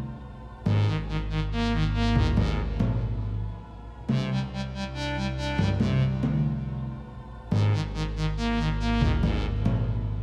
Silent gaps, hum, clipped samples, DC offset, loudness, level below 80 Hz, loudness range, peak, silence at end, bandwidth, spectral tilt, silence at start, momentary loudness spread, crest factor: none; none; under 0.1%; under 0.1%; -27 LUFS; -32 dBFS; 2 LU; -10 dBFS; 0 s; 9 kHz; -7.5 dB/octave; 0 s; 12 LU; 16 dB